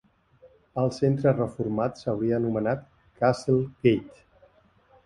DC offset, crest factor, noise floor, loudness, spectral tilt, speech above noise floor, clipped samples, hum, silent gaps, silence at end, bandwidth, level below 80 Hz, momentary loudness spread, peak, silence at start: under 0.1%; 20 dB; -60 dBFS; -26 LUFS; -8 dB/octave; 35 dB; under 0.1%; none; none; 0.95 s; 11.5 kHz; -58 dBFS; 6 LU; -8 dBFS; 0.75 s